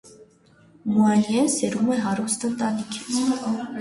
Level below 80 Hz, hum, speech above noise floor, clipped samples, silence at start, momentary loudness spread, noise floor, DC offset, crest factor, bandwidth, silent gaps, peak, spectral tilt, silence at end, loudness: -64 dBFS; none; 33 dB; under 0.1%; 0.05 s; 8 LU; -55 dBFS; under 0.1%; 14 dB; 11.5 kHz; none; -8 dBFS; -4.5 dB/octave; 0 s; -23 LUFS